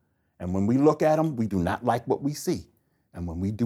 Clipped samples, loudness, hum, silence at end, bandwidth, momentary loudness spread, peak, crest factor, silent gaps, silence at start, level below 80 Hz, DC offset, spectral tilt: under 0.1%; -26 LUFS; none; 0 s; 16 kHz; 13 LU; -8 dBFS; 18 dB; none; 0.4 s; -52 dBFS; under 0.1%; -7 dB/octave